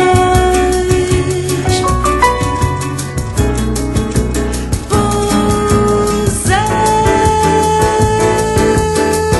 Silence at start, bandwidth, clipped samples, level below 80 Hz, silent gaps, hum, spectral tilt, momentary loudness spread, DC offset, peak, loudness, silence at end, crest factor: 0 s; 12.5 kHz; under 0.1%; -22 dBFS; none; none; -5 dB/octave; 5 LU; under 0.1%; 0 dBFS; -13 LUFS; 0 s; 12 dB